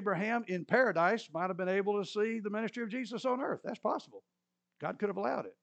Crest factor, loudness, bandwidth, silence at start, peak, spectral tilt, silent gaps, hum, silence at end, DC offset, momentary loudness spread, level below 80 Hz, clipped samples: 20 dB; -34 LUFS; 8.6 kHz; 0 s; -14 dBFS; -6 dB/octave; none; none; 0.1 s; under 0.1%; 9 LU; under -90 dBFS; under 0.1%